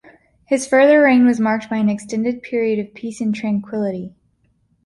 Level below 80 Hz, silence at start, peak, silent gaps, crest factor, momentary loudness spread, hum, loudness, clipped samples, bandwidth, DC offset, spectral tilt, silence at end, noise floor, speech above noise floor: -60 dBFS; 0.5 s; -2 dBFS; none; 16 dB; 13 LU; none; -17 LUFS; under 0.1%; 11.5 kHz; under 0.1%; -6 dB/octave; 0.75 s; -62 dBFS; 45 dB